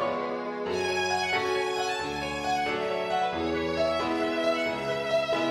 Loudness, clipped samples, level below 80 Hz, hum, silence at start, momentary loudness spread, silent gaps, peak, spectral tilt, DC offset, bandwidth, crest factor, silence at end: -28 LUFS; under 0.1%; -56 dBFS; none; 0 s; 4 LU; none; -14 dBFS; -4 dB/octave; under 0.1%; 15.5 kHz; 14 dB; 0 s